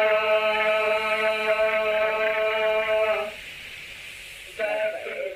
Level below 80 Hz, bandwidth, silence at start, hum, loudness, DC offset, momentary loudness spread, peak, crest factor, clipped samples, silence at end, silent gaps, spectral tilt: -58 dBFS; 15.5 kHz; 0 s; none; -23 LUFS; under 0.1%; 16 LU; -10 dBFS; 14 dB; under 0.1%; 0 s; none; -2 dB/octave